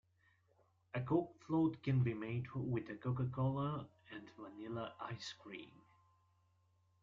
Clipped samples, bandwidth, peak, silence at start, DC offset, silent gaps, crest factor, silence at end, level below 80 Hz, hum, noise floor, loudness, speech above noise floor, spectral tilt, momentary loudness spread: under 0.1%; 7.4 kHz; -22 dBFS; 0.95 s; under 0.1%; none; 20 dB; 1.35 s; -72 dBFS; none; -76 dBFS; -41 LUFS; 36 dB; -8 dB/octave; 17 LU